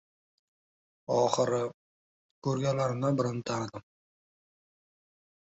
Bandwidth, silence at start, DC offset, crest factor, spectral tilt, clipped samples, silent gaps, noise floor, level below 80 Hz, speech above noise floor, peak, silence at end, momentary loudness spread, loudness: 8.2 kHz; 1.1 s; under 0.1%; 22 dB; -6 dB/octave; under 0.1%; 1.74-2.42 s; under -90 dBFS; -68 dBFS; over 61 dB; -10 dBFS; 1.7 s; 12 LU; -30 LUFS